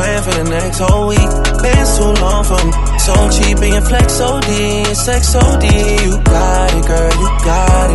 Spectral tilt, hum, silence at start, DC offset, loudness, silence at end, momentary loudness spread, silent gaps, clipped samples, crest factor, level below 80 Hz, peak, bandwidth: -4.5 dB/octave; none; 0 s; under 0.1%; -12 LUFS; 0 s; 3 LU; none; under 0.1%; 10 dB; -12 dBFS; 0 dBFS; 12 kHz